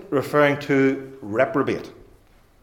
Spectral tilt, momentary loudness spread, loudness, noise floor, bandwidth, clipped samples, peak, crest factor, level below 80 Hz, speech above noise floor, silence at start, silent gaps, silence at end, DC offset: -6.5 dB/octave; 12 LU; -21 LUFS; -54 dBFS; 17.5 kHz; under 0.1%; -4 dBFS; 18 dB; -58 dBFS; 33 dB; 0 s; none; 0.7 s; under 0.1%